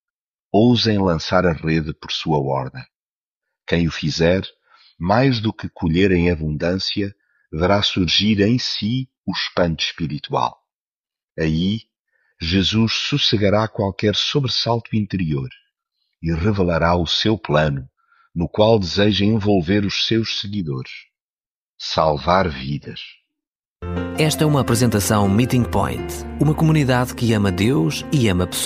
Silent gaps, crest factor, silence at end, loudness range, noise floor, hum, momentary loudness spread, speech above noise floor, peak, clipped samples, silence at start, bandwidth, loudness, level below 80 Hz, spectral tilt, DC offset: 2.95-3.41 s, 9.18-9.24 s, 10.73-11.04 s, 11.23-11.28 s, 11.99-12.05 s, 21.22-21.38 s, 21.46-21.78 s, 23.47-23.76 s; 18 dB; 0 s; 4 LU; under -90 dBFS; none; 12 LU; over 72 dB; -2 dBFS; under 0.1%; 0.55 s; 15.5 kHz; -19 LUFS; -40 dBFS; -5.5 dB/octave; under 0.1%